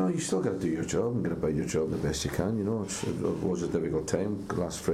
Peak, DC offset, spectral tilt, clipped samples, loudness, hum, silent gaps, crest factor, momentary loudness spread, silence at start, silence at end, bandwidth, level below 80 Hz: -12 dBFS; under 0.1%; -5.5 dB/octave; under 0.1%; -30 LUFS; none; none; 16 dB; 2 LU; 0 s; 0 s; 15.5 kHz; -50 dBFS